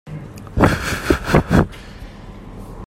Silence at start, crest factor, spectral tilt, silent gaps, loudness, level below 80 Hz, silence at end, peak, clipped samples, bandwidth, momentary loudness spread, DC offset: 0.05 s; 20 dB; -6 dB/octave; none; -18 LUFS; -30 dBFS; 0 s; 0 dBFS; under 0.1%; 16 kHz; 22 LU; under 0.1%